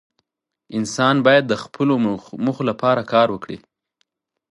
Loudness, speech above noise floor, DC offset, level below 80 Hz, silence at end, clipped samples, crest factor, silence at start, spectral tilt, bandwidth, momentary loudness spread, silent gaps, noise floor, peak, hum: -19 LUFS; 55 dB; under 0.1%; -60 dBFS; 0.95 s; under 0.1%; 18 dB; 0.7 s; -5.5 dB/octave; 11.5 kHz; 14 LU; none; -73 dBFS; -2 dBFS; none